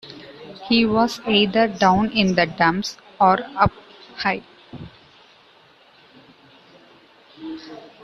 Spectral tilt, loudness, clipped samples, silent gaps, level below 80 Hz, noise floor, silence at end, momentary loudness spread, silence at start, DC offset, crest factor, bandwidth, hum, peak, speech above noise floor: -5.5 dB/octave; -19 LUFS; under 0.1%; none; -50 dBFS; -52 dBFS; 0.25 s; 23 LU; 0.05 s; under 0.1%; 20 dB; 12.5 kHz; none; -2 dBFS; 34 dB